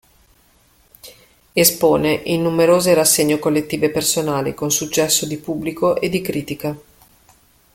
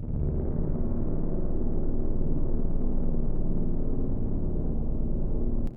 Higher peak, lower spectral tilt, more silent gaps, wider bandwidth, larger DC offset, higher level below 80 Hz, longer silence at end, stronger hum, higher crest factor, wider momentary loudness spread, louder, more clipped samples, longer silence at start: first, 0 dBFS vs -14 dBFS; second, -3.5 dB/octave vs -13.5 dB/octave; neither; first, 17 kHz vs 1.5 kHz; neither; second, -52 dBFS vs -26 dBFS; first, 0.95 s vs 0 s; neither; first, 18 dB vs 10 dB; first, 11 LU vs 1 LU; first, -17 LUFS vs -32 LUFS; neither; first, 1.05 s vs 0 s